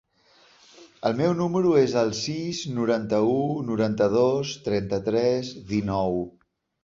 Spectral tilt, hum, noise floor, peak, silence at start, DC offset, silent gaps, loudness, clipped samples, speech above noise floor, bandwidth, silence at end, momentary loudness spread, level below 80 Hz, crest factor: -6 dB/octave; none; -59 dBFS; -8 dBFS; 0.8 s; under 0.1%; none; -24 LUFS; under 0.1%; 35 dB; 7.8 kHz; 0.55 s; 8 LU; -56 dBFS; 16 dB